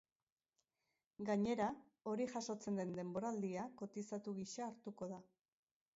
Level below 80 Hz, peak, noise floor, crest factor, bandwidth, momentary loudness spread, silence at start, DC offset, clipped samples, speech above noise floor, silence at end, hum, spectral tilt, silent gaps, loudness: -82 dBFS; -28 dBFS; under -90 dBFS; 18 dB; 7.6 kHz; 11 LU; 1.2 s; under 0.1%; under 0.1%; over 46 dB; 0.7 s; none; -6 dB/octave; none; -45 LUFS